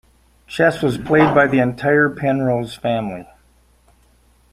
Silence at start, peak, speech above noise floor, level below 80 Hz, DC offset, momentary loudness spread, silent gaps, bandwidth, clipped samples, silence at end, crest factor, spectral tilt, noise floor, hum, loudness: 0.5 s; -2 dBFS; 38 dB; -50 dBFS; under 0.1%; 10 LU; none; 15 kHz; under 0.1%; 1.3 s; 18 dB; -7 dB/octave; -55 dBFS; none; -17 LUFS